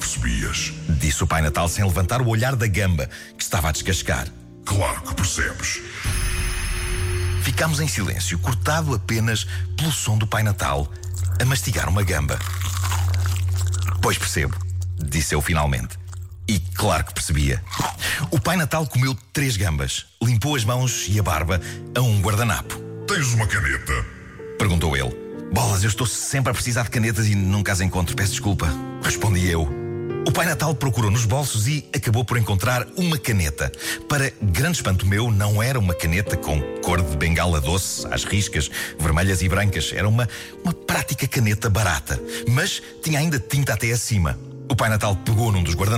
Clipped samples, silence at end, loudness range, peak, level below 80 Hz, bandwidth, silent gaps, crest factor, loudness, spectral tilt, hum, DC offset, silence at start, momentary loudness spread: under 0.1%; 0 s; 2 LU; -10 dBFS; -32 dBFS; 16.5 kHz; none; 10 dB; -22 LUFS; -4.5 dB/octave; none; under 0.1%; 0 s; 6 LU